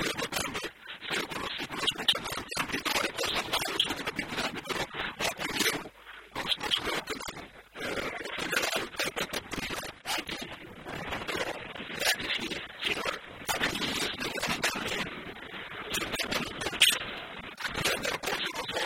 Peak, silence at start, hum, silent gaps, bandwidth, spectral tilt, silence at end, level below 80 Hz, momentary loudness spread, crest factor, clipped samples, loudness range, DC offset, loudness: -8 dBFS; 0 s; none; none; 16.5 kHz; -1.5 dB/octave; 0 s; -56 dBFS; 11 LU; 26 dB; under 0.1%; 4 LU; under 0.1%; -31 LUFS